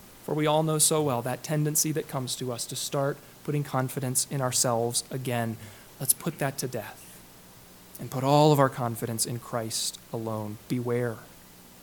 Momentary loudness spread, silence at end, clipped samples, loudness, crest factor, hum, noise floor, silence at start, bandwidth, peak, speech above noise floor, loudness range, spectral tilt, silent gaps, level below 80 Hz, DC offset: 14 LU; 0 s; under 0.1%; -27 LUFS; 22 dB; none; -51 dBFS; 0 s; 19 kHz; -6 dBFS; 23 dB; 4 LU; -4 dB/octave; none; -64 dBFS; under 0.1%